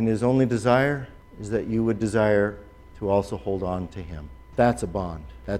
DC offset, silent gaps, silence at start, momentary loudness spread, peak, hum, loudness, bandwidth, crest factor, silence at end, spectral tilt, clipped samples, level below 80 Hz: under 0.1%; none; 0 s; 17 LU; -6 dBFS; none; -24 LUFS; 13 kHz; 18 dB; 0 s; -7 dB/octave; under 0.1%; -44 dBFS